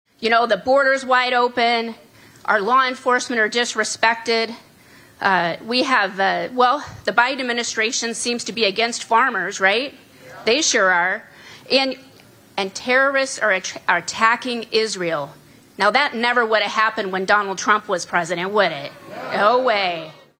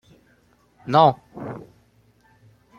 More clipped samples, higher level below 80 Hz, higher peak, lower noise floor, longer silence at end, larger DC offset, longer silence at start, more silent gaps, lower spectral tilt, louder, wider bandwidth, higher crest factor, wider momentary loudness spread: neither; about the same, -64 dBFS vs -64 dBFS; about the same, 0 dBFS vs -2 dBFS; second, -48 dBFS vs -60 dBFS; second, 0.3 s vs 1.2 s; neither; second, 0.2 s vs 0.85 s; neither; second, -2 dB/octave vs -7.5 dB/octave; about the same, -19 LUFS vs -18 LUFS; first, 16 kHz vs 7.2 kHz; about the same, 20 dB vs 24 dB; second, 8 LU vs 23 LU